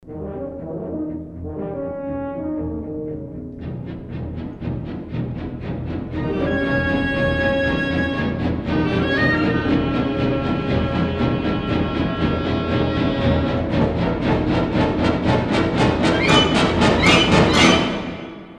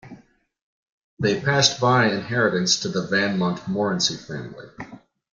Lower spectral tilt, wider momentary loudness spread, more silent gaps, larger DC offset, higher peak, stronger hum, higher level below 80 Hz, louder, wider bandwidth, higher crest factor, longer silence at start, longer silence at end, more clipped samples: first, -5.5 dB/octave vs -4 dB/octave; second, 15 LU vs 21 LU; second, none vs 0.62-1.17 s; neither; about the same, -2 dBFS vs -2 dBFS; neither; first, -34 dBFS vs -60 dBFS; about the same, -20 LUFS vs -21 LUFS; first, 11.5 kHz vs 9.4 kHz; about the same, 18 dB vs 22 dB; about the same, 0.05 s vs 0.05 s; second, 0 s vs 0.4 s; neither